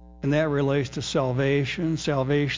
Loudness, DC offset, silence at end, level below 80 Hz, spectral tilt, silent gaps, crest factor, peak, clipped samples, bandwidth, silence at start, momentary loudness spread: -25 LUFS; under 0.1%; 0 s; -48 dBFS; -6 dB/octave; none; 14 dB; -10 dBFS; under 0.1%; 7.8 kHz; 0 s; 3 LU